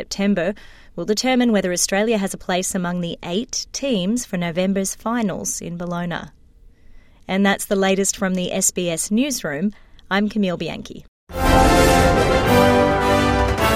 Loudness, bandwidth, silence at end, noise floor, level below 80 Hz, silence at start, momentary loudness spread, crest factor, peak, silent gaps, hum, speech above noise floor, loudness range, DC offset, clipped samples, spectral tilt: -19 LUFS; 16 kHz; 0 s; -47 dBFS; -32 dBFS; 0 s; 12 LU; 18 dB; -2 dBFS; 11.08-11.27 s; none; 27 dB; 7 LU; under 0.1%; under 0.1%; -4 dB/octave